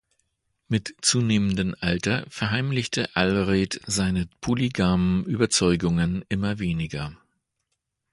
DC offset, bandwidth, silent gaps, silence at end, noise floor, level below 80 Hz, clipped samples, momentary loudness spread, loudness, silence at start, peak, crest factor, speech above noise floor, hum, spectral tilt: under 0.1%; 11.5 kHz; none; 1 s; -79 dBFS; -44 dBFS; under 0.1%; 7 LU; -24 LUFS; 0.7 s; -4 dBFS; 20 dB; 55 dB; none; -4.5 dB/octave